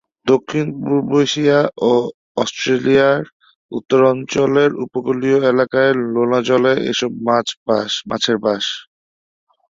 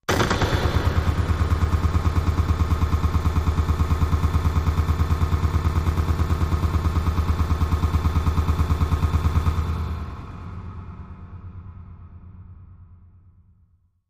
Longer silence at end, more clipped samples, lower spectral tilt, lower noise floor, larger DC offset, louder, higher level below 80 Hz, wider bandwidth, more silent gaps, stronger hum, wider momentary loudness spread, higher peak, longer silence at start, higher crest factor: second, 0.9 s vs 1.15 s; neither; second, -5 dB/octave vs -6.5 dB/octave; first, under -90 dBFS vs -60 dBFS; neither; first, -16 LUFS vs -23 LUFS; second, -58 dBFS vs -26 dBFS; second, 7.6 kHz vs 15.5 kHz; first, 2.14-2.35 s, 3.33-3.40 s, 3.55-3.69 s, 7.57-7.66 s vs none; neither; second, 8 LU vs 17 LU; first, -2 dBFS vs -6 dBFS; first, 0.25 s vs 0.1 s; about the same, 16 dB vs 16 dB